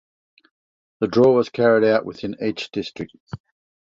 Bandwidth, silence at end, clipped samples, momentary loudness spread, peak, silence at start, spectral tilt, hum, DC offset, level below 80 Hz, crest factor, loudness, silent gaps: 7.6 kHz; 0.6 s; under 0.1%; 21 LU; -4 dBFS; 1 s; -7 dB/octave; none; under 0.1%; -58 dBFS; 18 dB; -20 LUFS; 3.20-3.27 s